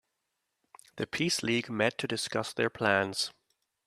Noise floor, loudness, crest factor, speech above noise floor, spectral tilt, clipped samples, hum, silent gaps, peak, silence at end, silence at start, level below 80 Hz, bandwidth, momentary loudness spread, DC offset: -83 dBFS; -30 LUFS; 24 dB; 52 dB; -3.5 dB/octave; under 0.1%; none; none; -8 dBFS; 0.55 s; 0.95 s; -70 dBFS; 14.5 kHz; 7 LU; under 0.1%